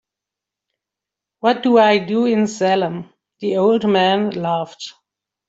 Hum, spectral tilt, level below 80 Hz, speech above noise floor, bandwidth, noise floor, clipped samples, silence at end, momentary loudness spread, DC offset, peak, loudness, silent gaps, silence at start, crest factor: none; -5.5 dB/octave; -64 dBFS; 69 dB; 8 kHz; -85 dBFS; under 0.1%; 0.6 s; 15 LU; under 0.1%; -2 dBFS; -17 LUFS; none; 1.45 s; 16 dB